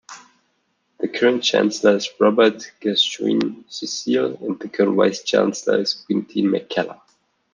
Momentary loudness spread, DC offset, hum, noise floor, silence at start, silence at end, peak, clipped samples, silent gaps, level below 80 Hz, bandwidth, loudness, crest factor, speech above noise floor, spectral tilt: 10 LU; under 0.1%; none; -68 dBFS; 0.1 s; 0.6 s; -2 dBFS; under 0.1%; none; -70 dBFS; 9.8 kHz; -20 LUFS; 18 dB; 49 dB; -4 dB/octave